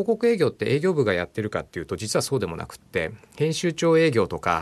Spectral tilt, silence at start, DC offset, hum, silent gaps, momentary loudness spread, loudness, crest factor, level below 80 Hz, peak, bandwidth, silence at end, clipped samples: -5.5 dB/octave; 0 s; under 0.1%; none; none; 11 LU; -24 LUFS; 16 dB; -56 dBFS; -8 dBFS; 13 kHz; 0 s; under 0.1%